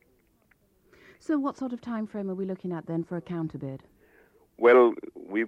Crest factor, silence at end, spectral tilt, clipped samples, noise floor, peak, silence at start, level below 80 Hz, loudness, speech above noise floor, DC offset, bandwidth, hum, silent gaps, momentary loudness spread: 20 dB; 0 s; -8 dB/octave; under 0.1%; -66 dBFS; -8 dBFS; 1.3 s; -68 dBFS; -27 LUFS; 40 dB; under 0.1%; 8 kHz; none; none; 20 LU